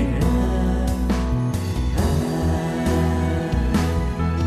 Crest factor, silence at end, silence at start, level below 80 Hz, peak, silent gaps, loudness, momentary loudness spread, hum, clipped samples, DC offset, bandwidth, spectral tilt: 12 dB; 0 s; 0 s; -26 dBFS; -8 dBFS; none; -22 LUFS; 3 LU; none; under 0.1%; under 0.1%; 14 kHz; -7 dB/octave